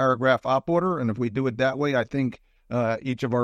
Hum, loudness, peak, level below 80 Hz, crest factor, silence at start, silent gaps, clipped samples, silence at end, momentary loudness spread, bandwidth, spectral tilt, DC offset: none; -25 LUFS; -8 dBFS; -58 dBFS; 16 dB; 0 s; none; under 0.1%; 0 s; 6 LU; 8.4 kHz; -7.5 dB/octave; under 0.1%